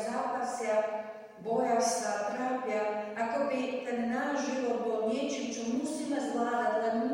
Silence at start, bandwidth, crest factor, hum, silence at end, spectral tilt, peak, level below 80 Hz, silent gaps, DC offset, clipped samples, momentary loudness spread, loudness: 0 s; 16 kHz; 14 dB; none; 0 s; -3.5 dB/octave; -18 dBFS; -78 dBFS; none; under 0.1%; under 0.1%; 5 LU; -32 LUFS